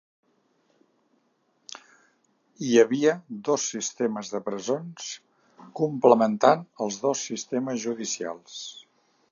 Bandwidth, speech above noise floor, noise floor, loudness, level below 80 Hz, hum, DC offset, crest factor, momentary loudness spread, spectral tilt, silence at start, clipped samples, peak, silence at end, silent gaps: 7.4 kHz; 45 dB; -69 dBFS; -25 LUFS; -80 dBFS; none; under 0.1%; 24 dB; 19 LU; -4 dB/octave; 2.6 s; under 0.1%; -2 dBFS; 0.5 s; none